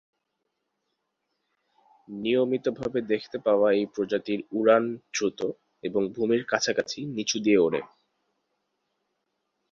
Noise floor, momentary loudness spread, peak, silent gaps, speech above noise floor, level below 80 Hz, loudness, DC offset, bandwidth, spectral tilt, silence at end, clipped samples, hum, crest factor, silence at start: -80 dBFS; 10 LU; -6 dBFS; none; 54 dB; -68 dBFS; -26 LUFS; under 0.1%; 7.6 kHz; -4 dB/octave; 1.85 s; under 0.1%; none; 20 dB; 2.1 s